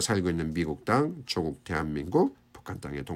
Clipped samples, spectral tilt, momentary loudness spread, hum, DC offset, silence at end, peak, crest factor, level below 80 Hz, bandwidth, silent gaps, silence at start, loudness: under 0.1%; -5 dB/octave; 11 LU; none; under 0.1%; 0 s; -10 dBFS; 18 dB; -50 dBFS; 16 kHz; none; 0 s; -29 LUFS